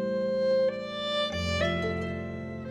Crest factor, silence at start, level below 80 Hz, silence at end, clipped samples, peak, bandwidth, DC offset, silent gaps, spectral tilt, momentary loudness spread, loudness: 12 dB; 0 s; -50 dBFS; 0 s; under 0.1%; -16 dBFS; 11 kHz; under 0.1%; none; -5.5 dB/octave; 9 LU; -29 LUFS